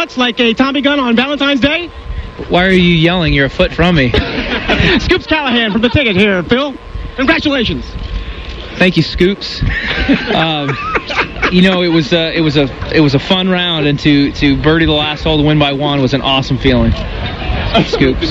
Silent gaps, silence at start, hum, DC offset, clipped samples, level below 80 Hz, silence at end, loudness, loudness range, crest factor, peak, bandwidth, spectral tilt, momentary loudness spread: none; 0 s; none; under 0.1%; under 0.1%; -26 dBFS; 0 s; -12 LUFS; 3 LU; 12 dB; 0 dBFS; 8.4 kHz; -6.5 dB/octave; 8 LU